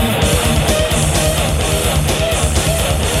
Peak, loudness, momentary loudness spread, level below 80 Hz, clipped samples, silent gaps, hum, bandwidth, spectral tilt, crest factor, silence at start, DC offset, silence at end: -2 dBFS; -15 LUFS; 2 LU; -20 dBFS; under 0.1%; none; none; 16.5 kHz; -4 dB/octave; 12 dB; 0 s; under 0.1%; 0 s